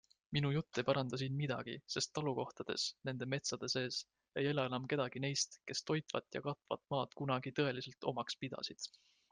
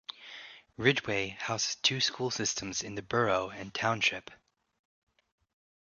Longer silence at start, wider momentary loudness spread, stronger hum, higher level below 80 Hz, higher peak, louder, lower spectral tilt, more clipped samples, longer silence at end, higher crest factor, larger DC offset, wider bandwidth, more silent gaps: first, 0.3 s vs 0.1 s; second, 7 LU vs 16 LU; neither; second, -76 dBFS vs -66 dBFS; second, -20 dBFS vs -8 dBFS; second, -40 LUFS vs -30 LUFS; first, -4.5 dB/octave vs -2.5 dB/octave; neither; second, 0.45 s vs 1.5 s; about the same, 22 dB vs 26 dB; neither; about the same, 10 kHz vs 10 kHz; neither